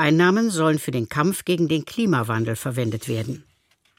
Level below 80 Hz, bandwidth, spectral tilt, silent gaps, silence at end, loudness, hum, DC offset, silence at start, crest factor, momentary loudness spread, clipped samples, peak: -58 dBFS; 16.5 kHz; -5.5 dB/octave; none; 0.55 s; -22 LUFS; none; under 0.1%; 0 s; 18 dB; 9 LU; under 0.1%; -4 dBFS